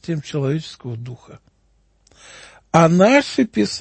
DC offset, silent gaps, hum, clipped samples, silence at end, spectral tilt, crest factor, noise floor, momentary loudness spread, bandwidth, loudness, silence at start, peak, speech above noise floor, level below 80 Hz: under 0.1%; none; none; under 0.1%; 0 s; -6 dB/octave; 18 dB; -60 dBFS; 19 LU; 8.8 kHz; -17 LUFS; 0.1 s; 0 dBFS; 42 dB; -56 dBFS